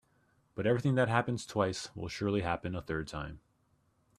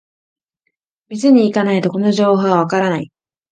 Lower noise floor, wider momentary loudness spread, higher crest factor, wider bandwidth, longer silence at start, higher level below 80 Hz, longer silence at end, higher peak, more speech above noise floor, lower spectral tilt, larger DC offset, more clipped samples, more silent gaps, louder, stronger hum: about the same, -72 dBFS vs -73 dBFS; about the same, 12 LU vs 11 LU; first, 22 dB vs 16 dB; first, 13 kHz vs 9.2 kHz; second, 0.55 s vs 1.1 s; first, -58 dBFS vs -64 dBFS; first, 0.8 s vs 0.45 s; second, -12 dBFS vs 0 dBFS; second, 40 dB vs 59 dB; about the same, -6 dB/octave vs -6.5 dB/octave; neither; neither; neither; second, -33 LUFS vs -15 LUFS; neither